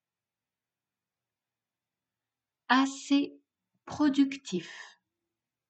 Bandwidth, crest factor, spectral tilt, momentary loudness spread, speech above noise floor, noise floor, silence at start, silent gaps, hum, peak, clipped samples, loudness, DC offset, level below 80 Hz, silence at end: 8.6 kHz; 22 dB; -4 dB/octave; 19 LU; over 62 dB; under -90 dBFS; 2.7 s; none; none; -10 dBFS; under 0.1%; -29 LUFS; under 0.1%; -76 dBFS; 0.85 s